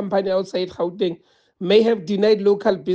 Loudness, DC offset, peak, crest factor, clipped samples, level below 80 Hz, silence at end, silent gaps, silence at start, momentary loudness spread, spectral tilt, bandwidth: -20 LUFS; under 0.1%; -4 dBFS; 16 dB; under 0.1%; -62 dBFS; 0 s; none; 0 s; 9 LU; -6.5 dB/octave; 7.8 kHz